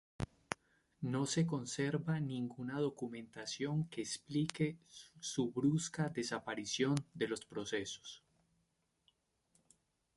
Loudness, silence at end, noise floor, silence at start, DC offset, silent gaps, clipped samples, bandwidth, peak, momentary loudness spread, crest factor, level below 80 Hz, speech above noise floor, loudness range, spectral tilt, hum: -39 LUFS; 2 s; -81 dBFS; 0.2 s; under 0.1%; none; under 0.1%; 11.5 kHz; -14 dBFS; 11 LU; 26 dB; -68 dBFS; 42 dB; 4 LU; -5 dB/octave; none